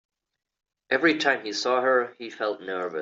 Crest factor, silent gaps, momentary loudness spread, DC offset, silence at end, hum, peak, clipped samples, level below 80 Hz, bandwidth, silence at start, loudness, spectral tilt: 18 dB; none; 10 LU; under 0.1%; 0 s; none; -8 dBFS; under 0.1%; -74 dBFS; 7.8 kHz; 0.9 s; -25 LUFS; -3 dB/octave